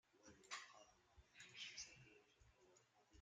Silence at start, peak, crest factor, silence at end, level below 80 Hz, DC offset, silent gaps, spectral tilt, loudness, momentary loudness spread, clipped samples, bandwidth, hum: 0.05 s; -36 dBFS; 26 dB; 0 s; -82 dBFS; under 0.1%; none; -0.5 dB/octave; -57 LUFS; 15 LU; under 0.1%; 9.4 kHz; none